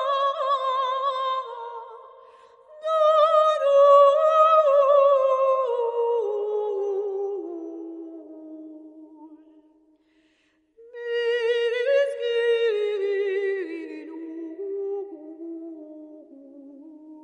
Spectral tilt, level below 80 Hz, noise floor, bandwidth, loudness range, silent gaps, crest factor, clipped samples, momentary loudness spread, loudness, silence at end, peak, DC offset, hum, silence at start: -2 dB/octave; -82 dBFS; -66 dBFS; 8.6 kHz; 18 LU; none; 18 dB; under 0.1%; 22 LU; -22 LUFS; 0.05 s; -6 dBFS; under 0.1%; none; 0 s